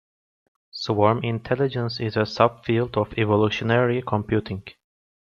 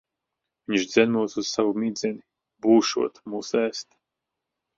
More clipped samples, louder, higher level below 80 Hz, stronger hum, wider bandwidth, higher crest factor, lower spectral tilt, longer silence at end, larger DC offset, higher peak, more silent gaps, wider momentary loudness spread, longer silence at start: neither; about the same, -23 LUFS vs -24 LUFS; first, -54 dBFS vs -68 dBFS; neither; about the same, 7.2 kHz vs 7.6 kHz; about the same, 22 dB vs 20 dB; first, -7.5 dB/octave vs -4 dB/octave; second, 0.65 s vs 0.95 s; neither; about the same, -2 dBFS vs -4 dBFS; neither; second, 6 LU vs 13 LU; about the same, 0.75 s vs 0.7 s